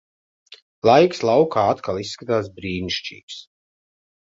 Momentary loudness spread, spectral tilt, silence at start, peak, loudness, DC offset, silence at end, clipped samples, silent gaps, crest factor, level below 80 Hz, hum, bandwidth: 19 LU; -5.5 dB/octave; 0.5 s; -2 dBFS; -20 LUFS; under 0.1%; 0.9 s; under 0.1%; 0.62-0.82 s, 3.23-3.28 s; 20 dB; -52 dBFS; none; 7.8 kHz